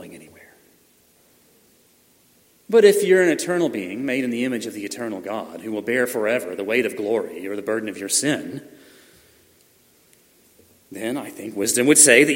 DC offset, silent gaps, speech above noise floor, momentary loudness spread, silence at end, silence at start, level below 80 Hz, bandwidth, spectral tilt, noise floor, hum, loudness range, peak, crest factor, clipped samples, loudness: under 0.1%; none; 38 dB; 16 LU; 0 s; 0 s; -72 dBFS; 16.5 kHz; -2.5 dB/octave; -58 dBFS; none; 8 LU; 0 dBFS; 22 dB; under 0.1%; -20 LUFS